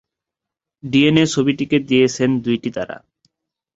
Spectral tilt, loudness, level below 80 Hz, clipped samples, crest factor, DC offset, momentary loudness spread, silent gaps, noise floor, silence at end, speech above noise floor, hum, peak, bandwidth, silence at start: -5.5 dB/octave; -17 LUFS; -54 dBFS; under 0.1%; 18 dB; under 0.1%; 15 LU; none; -85 dBFS; 0.8 s; 69 dB; none; -2 dBFS; 8 kHz; 0.85 s